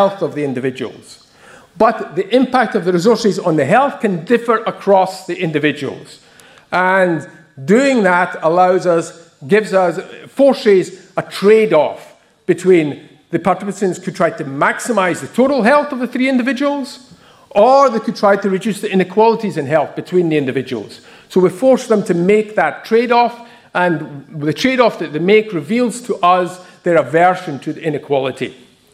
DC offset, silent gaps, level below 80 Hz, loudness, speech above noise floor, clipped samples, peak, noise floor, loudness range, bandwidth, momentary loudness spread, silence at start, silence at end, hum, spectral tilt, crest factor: under 0.1%; none; -60 dBFS; -15 LUFS; 29 dB; under 0.1%; 0 dBFS; -43 dBFS; 2 LU; 14.5 kHz; 11 LU; 0 s; 0.4 s; none; -6 dB/octave; 14 dB